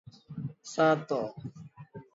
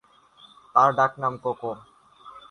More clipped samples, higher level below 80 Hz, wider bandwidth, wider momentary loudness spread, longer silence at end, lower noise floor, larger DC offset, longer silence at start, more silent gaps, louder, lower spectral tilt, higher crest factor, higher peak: neither; about the same, -70 dBFS vs -68 dBFS; second, 8 kHz vs 10.5 kHz; first, 23 LU vs 15 LU; about the same, 0.15 s vs 0.1 s; second, -49 dBFS vs -54 dBFS; neither; second, 0.3 s vs 0.75 s; neither; second, -30 LUFS vs -23 LUFS; about the same, -6 dB/octave vs -6 dB/octave; about the same, 20 dB vs 22 dB; second, -12 dBFS vs -4 dBFS